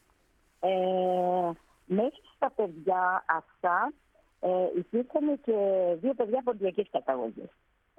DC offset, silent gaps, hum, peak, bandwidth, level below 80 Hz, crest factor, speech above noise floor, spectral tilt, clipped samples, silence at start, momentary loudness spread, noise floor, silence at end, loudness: under 0.1%; none; none; -12 dBFS; 3.7 kHz; -72 dBFS; 18 dB; 39 dB; -8 dB/octave; under 0.1%; 0.6 s; 6 LU; -68 dBFS; 0.5 s; -29 LUFS